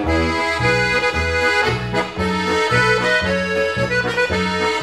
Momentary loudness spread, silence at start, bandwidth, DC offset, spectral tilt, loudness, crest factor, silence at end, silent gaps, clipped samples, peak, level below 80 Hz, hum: 5 LU; 0 s; 14.5 kHz; 0.2%; -4.5 dB/octave; -17 LUFS; 14 dB; 0 s; none; under 0.1%; -4 dBFS; -34 dBFS; none